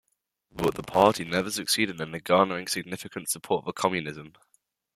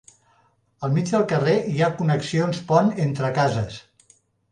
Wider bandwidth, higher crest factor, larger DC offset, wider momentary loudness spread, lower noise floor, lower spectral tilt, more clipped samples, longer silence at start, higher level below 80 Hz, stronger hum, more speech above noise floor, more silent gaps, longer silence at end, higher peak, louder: first, 16 kHz vs 10 kHz; first, 24 dB vs 18 dB; neither; first, 13 LU vs 8 LU; first, -73 dBFS vs -62 dBFS; second, -3.5 dB/octave vs -6.5 dB/octave; neither; second, 0.55 s vs 0.8 s; about the same, -60 dBFS vs -56 dBFS; neither; first, 46 dB vs 41 dB; neither; about the same, 0.65 s vs 0.7 s; about the same, -4 dBFS vs -4 dBFS; second, -26 LUFS vs -22 LUFS